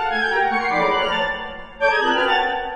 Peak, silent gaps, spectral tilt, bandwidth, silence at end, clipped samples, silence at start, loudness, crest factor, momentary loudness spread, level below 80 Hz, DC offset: -6 dBFS; none; -3.5 dB/octave; 9 kHz; 0 s; under 0.1%; 0 s; -19 LUFS; 16 dB; 6 LU; -46 dBFS; under 0.1%